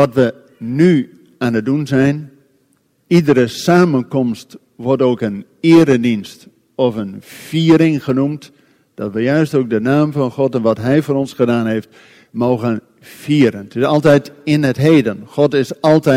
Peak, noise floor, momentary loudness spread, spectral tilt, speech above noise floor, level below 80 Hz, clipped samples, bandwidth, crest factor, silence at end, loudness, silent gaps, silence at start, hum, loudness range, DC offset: 0 dBFS; -59 dBFS; 13 LU; -7 dB/octave; 45 dB; -54 dBFS; under 0.1%; 15.5 kHz; 14 dB; 0 s; -15 LUFS; none; 0 s; none; 3 LU; under 0.1%